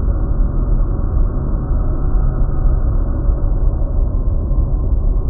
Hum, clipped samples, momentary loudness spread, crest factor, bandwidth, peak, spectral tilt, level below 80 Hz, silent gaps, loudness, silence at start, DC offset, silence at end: none; under 0.1%; 1 LU; 12 dB; 1.6 kHz; -2 dBFS; -10.5 dB/octave; -14 dBFS; none; -20 LUFS; 0 s; under 0.1%; 0 s